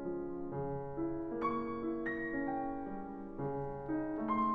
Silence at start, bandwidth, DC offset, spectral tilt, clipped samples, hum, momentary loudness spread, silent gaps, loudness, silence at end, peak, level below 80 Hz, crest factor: 0 s; 4.9 kHz; under 0.1%; -10 dB/octave; under 0.1%; none; 5 LU; none; -39 LUFS; 0 s; -24 dBFS; -58 dBFS; 14 dB